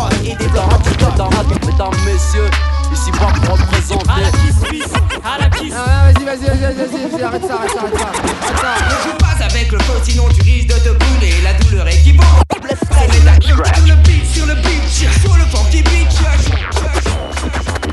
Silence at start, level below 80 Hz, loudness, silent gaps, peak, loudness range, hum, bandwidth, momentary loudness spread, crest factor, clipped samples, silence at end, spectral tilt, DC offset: 0 s; -12 dBFS; -13 LUFS; none; 0 dBFS; 5 LU; none; 12 kHz; 8 LU; 10 dB; under 0.1%; 0 s; -5 dB/octave; under 0.1%